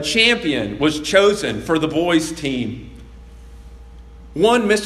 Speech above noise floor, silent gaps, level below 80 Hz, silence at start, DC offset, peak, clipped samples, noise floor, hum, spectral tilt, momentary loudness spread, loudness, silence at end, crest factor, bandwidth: 22 dB; none; -42 dBFS; 0 s; under 0.1%; 0 dBFS; under 0.1%; -39 dBFS; none; -4 dB/octave; 10 LU; -17 LUFS; 0 s; 18 dB; 13.5 kHz